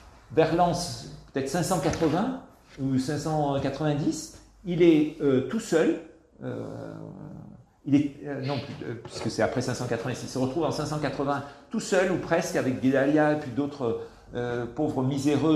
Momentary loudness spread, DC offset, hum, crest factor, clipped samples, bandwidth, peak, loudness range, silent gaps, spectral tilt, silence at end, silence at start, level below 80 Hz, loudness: 15 LU; under 0.1%; none; 18 dB; under 0.1%; 13.5 kHz; -8 dBFS; 4 LU; none; -6 dB/octave; 0 s; 0.05 s; -54 dBFS; -27 LUFS